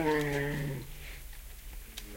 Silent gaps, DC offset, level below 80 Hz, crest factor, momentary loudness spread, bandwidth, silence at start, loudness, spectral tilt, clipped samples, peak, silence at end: none; under 0.1%; -46 dBFS; 18 dB; 17 LU; 16.5 kHz; 0 s; -35 LUFS; -5.5 dB/octave; under 0.1%; -18 dBFS; 0 s